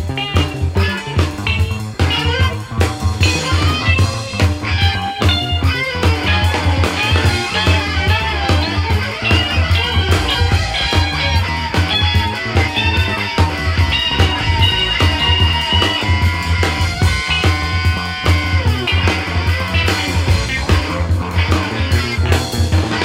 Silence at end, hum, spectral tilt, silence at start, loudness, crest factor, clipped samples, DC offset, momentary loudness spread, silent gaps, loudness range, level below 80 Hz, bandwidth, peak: 0 s; none; -4.5 dB/octave; 0 s; -15 LUFS; 14 dB; under 0.1%; under 0.1%; 4 LU; none; 2 LU; -24 dBFS; 15.5 kHz; 0 dBFS